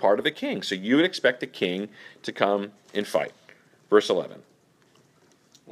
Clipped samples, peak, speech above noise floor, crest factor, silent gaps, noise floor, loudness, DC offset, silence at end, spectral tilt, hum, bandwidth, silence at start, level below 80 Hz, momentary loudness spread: under 0.1%; -2 dBFS; 36 dB; 24 dB; none; -61 dBFS; -25 LUFS; under 0.1%; 1.3 s; -4.5 dB/octave; none; 14 kHz; 0 s; -76 dBFS; 14 LU